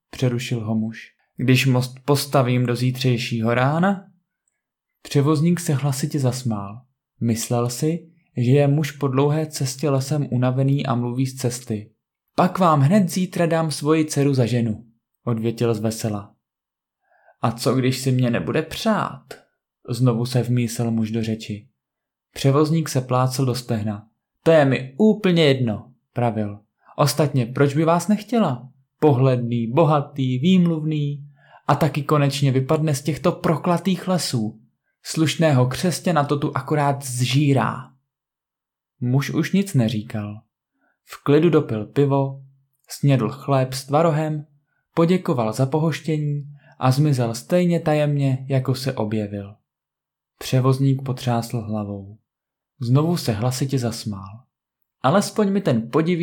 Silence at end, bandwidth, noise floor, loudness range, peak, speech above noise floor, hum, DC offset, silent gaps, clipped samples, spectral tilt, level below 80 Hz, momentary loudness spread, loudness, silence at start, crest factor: 0 s; 17.5 kHz; -87 dBFS; 4 LU; -6 dBFS; 67 dB; none; under 0.1%; none; under 0.1%; -6.5 dB/octave; -60 dBFS; 12 LU; -21 LUFS; 0.15 s; 16 dB